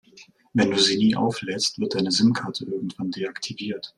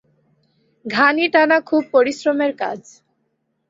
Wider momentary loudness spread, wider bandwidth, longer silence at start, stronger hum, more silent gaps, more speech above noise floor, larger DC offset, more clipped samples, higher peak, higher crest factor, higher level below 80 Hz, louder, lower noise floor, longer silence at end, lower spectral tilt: about the same, 11 LU vs 12 LU; first, 12 kHz vs 7.8 kHz; second, 0.15 s vs 0.85 s; neither; neither; second, 29 dB vs 53 dB; neither; neither; second, -6 dBFS vs -2 dBFS; about the same, 18 dB vs 18 dB; first, -62 dBFS vs -68 dBFS; second, -23 LUFS vs -17 LUFS; second, -52 dBFS vs -70 dBFS; second, 0.1 s vs 0.9 s; about the same, -4 dB/octave vs -4 dB/octave